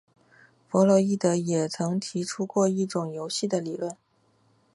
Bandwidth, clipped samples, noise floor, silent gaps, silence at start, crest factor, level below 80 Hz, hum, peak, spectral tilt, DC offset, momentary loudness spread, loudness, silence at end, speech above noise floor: 11.5 kHz; under 0.1%; -65 dBFS; none; 0.7 s; 18 dB; -74 dBFS; none; -8 dBFS; -5.5 dB/octave; under 0.1%; 11 LU; -26 LUFS; 0.8 s; 40 dB